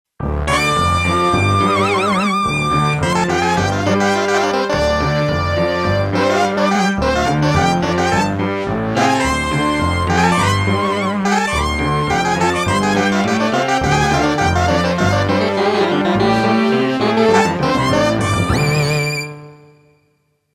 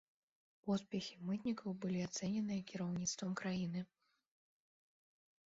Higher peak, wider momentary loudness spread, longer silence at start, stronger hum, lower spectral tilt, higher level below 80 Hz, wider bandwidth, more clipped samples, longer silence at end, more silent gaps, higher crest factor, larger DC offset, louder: first, 0 dBFS vs -28 dBFS; about the same, 3 LU vs 4 LU; second, 0.2 s vs 0.65 s; neither; about the same, -5.5 dB/octave vs -6 dB/octave; first, -32 dBFS vs -76 dBFS; first, 16 kHz vs 7.6 kHz; neither; second, 1 s vs 1.65 s; neither; about the same, 16 dB vs 16 dB; neither; first, -15 LUFS vs -42 LUFS